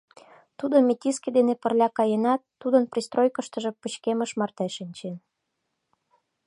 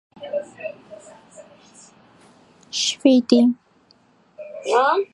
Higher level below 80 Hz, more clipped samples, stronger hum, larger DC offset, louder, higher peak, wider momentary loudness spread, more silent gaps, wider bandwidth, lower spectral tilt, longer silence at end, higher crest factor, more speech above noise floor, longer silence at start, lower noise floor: about the same, -78 dBFS vs -74 dBFS; neither; neither; neither; second, -25 LUFS vs -19 LUFS; second, -8 dBFS vs -2 dBFS; second, 12 LU vs 24 LU; neither; about the same, 11.5 kHz vs 11 kHz; first, -5 dB/octave vs -3 dB/octave; first, 1.3 s vs 0.1 s; about the same, 18 dB vs 22 dB; first, 55 dB vs 40 dB; first, 0.6 s vs 0.2 s; first, -79 dBFS vs -57 dBFS